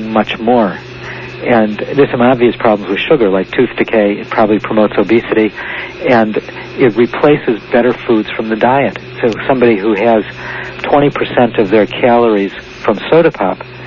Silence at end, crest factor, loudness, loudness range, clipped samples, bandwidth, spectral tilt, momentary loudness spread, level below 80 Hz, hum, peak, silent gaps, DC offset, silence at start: 0 s; 12 dB; -12 LUFS; 1 LU; under 0.1%; 7 kHz; -7.5 dB/octave; 10 LU; -44 dBFS; none; 0 dBFS; none; under 0.1%; 0 s